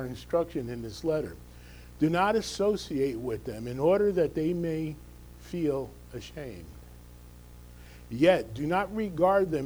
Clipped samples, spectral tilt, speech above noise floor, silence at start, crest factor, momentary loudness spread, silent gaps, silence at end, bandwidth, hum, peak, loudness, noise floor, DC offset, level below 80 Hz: under 0.1%; -6.5 dB/octave; 21 dB; 0 s; 20 dB; 23 LU; none; 0 s; over 20 kHz; 60 Hz at -50 dBFS; -10 dBFS; -29 LUFS; -49 dBFS; under 0.1%; -50 dBFS